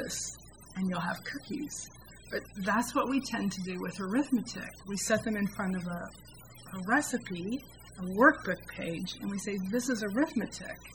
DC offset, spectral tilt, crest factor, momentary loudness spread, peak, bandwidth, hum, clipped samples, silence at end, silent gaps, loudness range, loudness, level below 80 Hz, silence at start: under 0.1%; -4.5 dB/octave; 24 dB; 13 LU; -8 dBFS; 19 kHz; none; under 0.1%; 0 s; none; 3 LU; -33 LUFS; -60 dBFS; 0 s